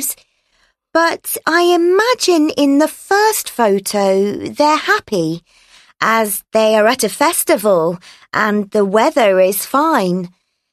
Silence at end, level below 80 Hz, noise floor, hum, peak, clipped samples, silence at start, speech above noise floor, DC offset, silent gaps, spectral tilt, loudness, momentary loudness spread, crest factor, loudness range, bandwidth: 0.45 s; -60 dBFS; -60 dBFS; none; 0 dBFS; under 0.1%; 0 s; 46 dB; under 0.1%; none; -3.5 dB/octave; -14 LUFS; 8 LU; 14 dB; 2 LU; 13.5 kHz